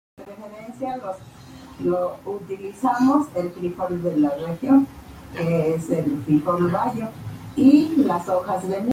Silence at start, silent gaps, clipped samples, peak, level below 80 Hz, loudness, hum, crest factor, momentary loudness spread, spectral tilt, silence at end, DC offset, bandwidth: 0.2 s; none; under 0.1%; -4 dBFS; -54 dBFS; -22 LUFS; none; 18 dB; 18 LU; -8 dB/octave; 0 s; under 0.1%; 15.5 kHz